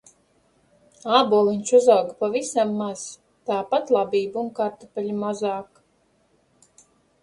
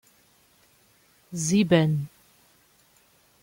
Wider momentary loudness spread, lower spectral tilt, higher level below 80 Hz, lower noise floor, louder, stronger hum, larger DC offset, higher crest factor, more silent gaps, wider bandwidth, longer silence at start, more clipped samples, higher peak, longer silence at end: second, 14 LU vs 18 LU; about the same, -4.5 dB/octave vs -5.5 dB/octave; second, -70 dBFS vs -64 dBFS; about the same, -64 dBFS vs -61 dBFS; about the same, -22 LUFS vs -23 LUFS; neither; neither; about the same, 22 dB vs 22 dB; neither; second, 11.5 kHz vs 16.5 kHz; second, 1.05 s vs 1.3 s; neither; first, -2 dBFS vs -8 dBFS; first, 1.6 s vs 1.35 s